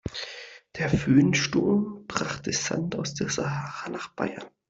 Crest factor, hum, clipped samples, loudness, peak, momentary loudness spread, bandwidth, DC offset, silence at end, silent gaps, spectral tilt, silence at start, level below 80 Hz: 20 dB; none; under 0.1%; -27 LUFS; -8 dBFS; 14 LU; 8 kHz; under 0.1%; 0.2 s; none; -5 dB/octave; 0.05 s; -52 dBFS